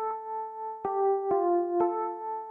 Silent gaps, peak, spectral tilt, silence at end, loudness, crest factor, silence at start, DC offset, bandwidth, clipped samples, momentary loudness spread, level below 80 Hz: none; -14 dBFS; -10 dB/octave; 0 s; -29 LUFS; 14 dB; 0 s; under 0.1%; 2.7 kHz; under 0.1%; 9 LU; -74 dBFS